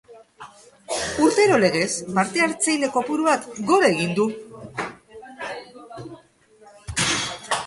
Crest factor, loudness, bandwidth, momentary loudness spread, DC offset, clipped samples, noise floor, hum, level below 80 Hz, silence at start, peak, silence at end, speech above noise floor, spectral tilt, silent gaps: 18 dB; -21 LUFS; 11.5 kHz; 20 LU; under 0.1%; under 0.1%; -53 dBFS; none; -52 dBFS; 0.1 s; -4 dBFS; 0 s; 33 dB; -3.5 dB/octave; none